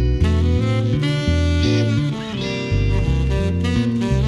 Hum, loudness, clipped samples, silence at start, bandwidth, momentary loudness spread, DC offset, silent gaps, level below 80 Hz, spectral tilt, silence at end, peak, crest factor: none; -19 LUFS; under 0.1%; 0 s; 11 kHz; 4 LU; under 0.1%; none; -24 dBFS; -7 dB/octave; 0 s; -6 dBFS; 12 dB